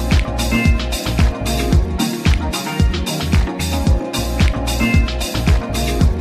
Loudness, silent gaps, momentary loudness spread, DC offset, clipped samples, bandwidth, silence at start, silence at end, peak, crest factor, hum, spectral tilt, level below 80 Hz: -18 LUFS; none; 4 LU; under 0.1%; under 0.1%; 15 kHz; 0 s; 0 s; -2 dBFS; 14 dB; none; -5 dB/octave; -18 dBFS